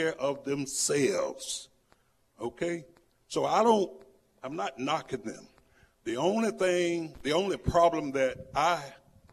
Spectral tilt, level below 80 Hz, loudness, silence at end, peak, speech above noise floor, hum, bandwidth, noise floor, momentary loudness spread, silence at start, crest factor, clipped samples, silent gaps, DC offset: -4 dB/octave; -56 dBFS; -30 LUFS; 0.35 s; -12 dBFS; 38 dB; none; 14 kHz; -67 dBFS; 15 LU; 0 s; 20 dB; under 0.1%; none; under 0.1%